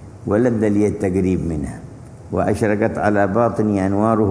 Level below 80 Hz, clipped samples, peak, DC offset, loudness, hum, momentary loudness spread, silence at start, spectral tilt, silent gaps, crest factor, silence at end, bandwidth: -42 dBFS; under 0.1%; -2 dBFS; under 0.1%; -18 LUFS; none; 10 LU; 0 s; -8.5 dB/octave; none; 16 dB; 0 s; 11 kHz